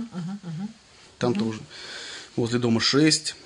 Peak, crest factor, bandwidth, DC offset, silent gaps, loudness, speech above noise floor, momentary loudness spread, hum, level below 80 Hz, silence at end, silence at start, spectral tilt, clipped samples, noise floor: -8 dBFS; 18 dB; 11 kHz; under 0.1%; none; -24 LUFS; 28 dB; 17 LU; none; -64 dBFS; 0 s; 0 s; -4 dB/octave; under 0.1%; -51 dBFS